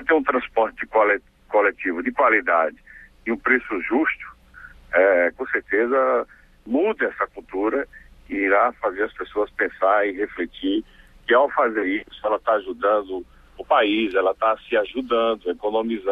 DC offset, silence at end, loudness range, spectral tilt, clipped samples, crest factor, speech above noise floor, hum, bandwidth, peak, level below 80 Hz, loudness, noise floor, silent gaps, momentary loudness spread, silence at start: under 0.1%; 0 s; 2 LU; -6 dB/octave; under 0.1%; 18 dB; 24 dB; none; 4.9 kHz; -2 dBFS; -54 dBFS; -21 LUFS; -45 dBFS; none; 9 LU; 0 s